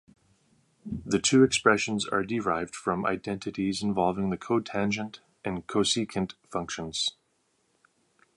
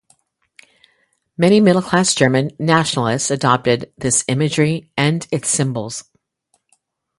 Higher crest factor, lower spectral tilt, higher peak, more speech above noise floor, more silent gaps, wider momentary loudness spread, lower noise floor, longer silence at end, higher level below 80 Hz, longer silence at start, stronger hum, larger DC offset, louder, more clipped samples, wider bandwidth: about the same, 22 dB vs 18 dB; about the same, -4 dB/octave vs -4.5 dB/octave; second, -6 dBFS vs 0 dBFS; second, 44 dB vs 50 dB; neither; first, 13 LU vs 7 LU; first, -72 dBFS vs -66 dBFS; about the same, 1.25 s vs 1.15 s; about the same, -58 dBFS vs -54 dBFS; second, 0.85 s vs 1.4 s; neither; neither; second, -28 LUFS vs -16 LUFS; neither; about the same, 11.5 kHz vs 11.5 kHz